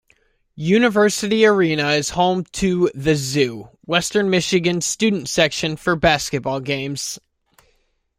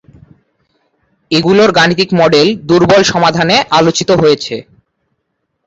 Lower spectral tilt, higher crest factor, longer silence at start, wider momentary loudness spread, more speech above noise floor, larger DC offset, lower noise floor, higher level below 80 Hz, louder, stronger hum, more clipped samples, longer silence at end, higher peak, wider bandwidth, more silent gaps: about the same, -4 dB/octave vs -4.5 dB/octave; first, 18 dB vs 12 dB; second, 0.55 s vs 1.3 s; about the same, 8 LU vs 6 LU; second, 46 dB vs 59 dB; neither; second, -64 dBFS vs -68 dBFS; about the same, -46 dBFS vs -44 dBFS; second, -18 LUFS vs -9 LUFS; neither; neither; about the same, 1 s vs 1.05 s; about the same, -2 dBFS vs 0 dBFS; first, 16 kHz vs 8 kHz; neither